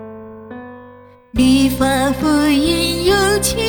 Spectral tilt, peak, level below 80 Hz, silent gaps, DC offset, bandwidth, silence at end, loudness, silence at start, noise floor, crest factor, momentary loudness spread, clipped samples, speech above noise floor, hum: -4 dB/octave; -2 dBFS; -32 dBFS; none; under 0.1%; over 20 kHz; 0 s; -15 LUFS; 0 s; -42 dBFS; 14 dB; 20 LU; under 0.1%; 28 dB; 50 Hz at -55 dBFS